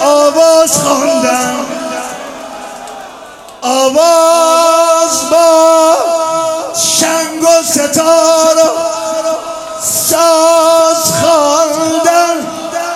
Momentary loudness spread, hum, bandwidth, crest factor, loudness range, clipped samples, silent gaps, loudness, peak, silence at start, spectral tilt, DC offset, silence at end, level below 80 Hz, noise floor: 13 LU; none; 16.5 kHz; 10 dB; 4 LU; 0.3%; none; -9 LUFS; 0 dBFS; 0 s; -2 dB/octave; under 0.1%; 0 s; -54 dBFS; -31 dBFS